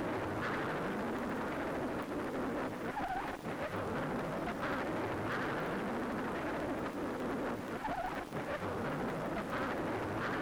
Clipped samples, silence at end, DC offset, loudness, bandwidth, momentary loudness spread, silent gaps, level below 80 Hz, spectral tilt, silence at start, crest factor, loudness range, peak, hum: under 0.1%; 0 s; under 0.1%; -38 LUFS; over 20 kHz; 3 LU; none; -58 dBFS; -6 dB/octave; 0 s; 12 dB; 1 LU; -26 dBFS; none